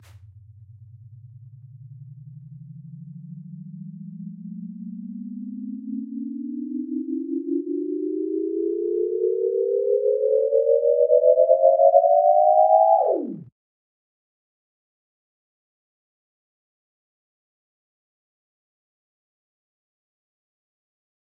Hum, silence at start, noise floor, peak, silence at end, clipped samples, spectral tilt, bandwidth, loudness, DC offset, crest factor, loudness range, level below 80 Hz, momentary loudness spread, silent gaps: none; 0.15 s; -47 dBFS; -2 dBFS; 7.8 s; under 0.1%; -9.5 dB/octave; 1.3 kHz; -20 LUFS; under 0.1%; 22 dB; 21 LU; -78 dBFS; 24 LU; none